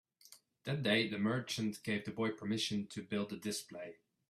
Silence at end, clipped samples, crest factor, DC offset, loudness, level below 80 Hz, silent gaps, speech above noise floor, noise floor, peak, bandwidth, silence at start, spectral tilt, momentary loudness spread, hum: 0.4 s; under 0.1%; 18 dB; under 0.1%; -37 LUFS; -76 dBFS; none; 26 dB; -64 dBFS; -20 dBFS; 14.5 kHz; 0.3 s; -4.5 dB/octave; 13 LU; none